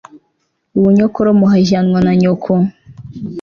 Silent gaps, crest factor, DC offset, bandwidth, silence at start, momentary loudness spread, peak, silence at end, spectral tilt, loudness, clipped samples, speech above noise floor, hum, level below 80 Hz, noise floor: none; 10 dB; under 0.1%; 7 kHz; 0.15 s; 13 LU; -2 dBFS; 0 s; -8 dB/octave; -12 LUFS; under 0.1%; 55 dB; none; -46 dBFS; -65 dBFS